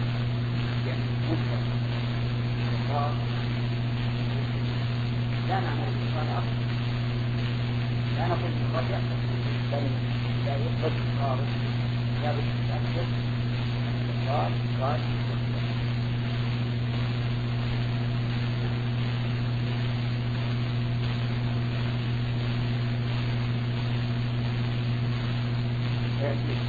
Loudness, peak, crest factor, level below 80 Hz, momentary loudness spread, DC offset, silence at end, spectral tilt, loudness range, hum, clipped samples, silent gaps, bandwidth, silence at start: -28 LUFS; -14 dBFS; 14 dB; -42 dBFS; 1 LU; under 0.1%; 0 s; -8 dB/octave; 1 LU; none; under 0.1%; none; 6.8 kHz; 0 s